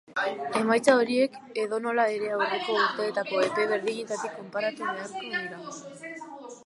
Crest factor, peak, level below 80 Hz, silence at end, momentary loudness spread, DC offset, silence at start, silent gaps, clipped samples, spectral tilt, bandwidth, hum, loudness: 20 dB; -8 dBFS; -80 dBFS; 0.05 s; 17 LU; under 0.1%; 0.1 s; none; under 0.1%; -3.5 dB/octave; 11.5 kHz; none; -27 LUFS